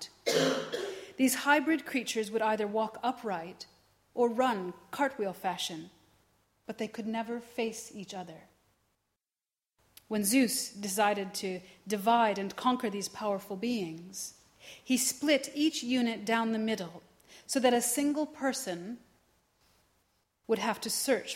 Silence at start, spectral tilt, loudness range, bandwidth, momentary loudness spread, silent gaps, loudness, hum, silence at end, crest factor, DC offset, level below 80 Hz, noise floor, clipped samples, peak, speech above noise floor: 0 s; -3 dB/octave; 8 LU; 16.5 kHz; 16 LU; none; -31 LUFS; none; 0 s; 22 dB; under 0.1%; -76 dBFS; under -90 dBFS; under 0.1%; -12 dBFS; over 59 dB